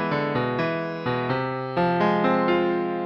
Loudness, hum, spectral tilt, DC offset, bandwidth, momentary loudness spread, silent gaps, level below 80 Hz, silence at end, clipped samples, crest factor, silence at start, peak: -24 LUFS; none; -8.5 dB/octave; under 0.1%; 6.4 kHz; 6 LU; none; -58 dBFS; 0 s; under 0.1%; 14 dB; 0 s; -8 dBFS